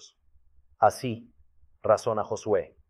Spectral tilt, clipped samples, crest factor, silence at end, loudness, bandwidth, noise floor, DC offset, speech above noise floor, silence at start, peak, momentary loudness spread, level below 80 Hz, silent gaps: -5.5 dB/octave; under 0.1%; 22 dB; 0.25 s; -27 LUFS; 13.5 kHz; -60 dBFS; under 0.1%; 34 dB; 0.8 s; -8 dBFS; 10 LU; -64 dBFS; none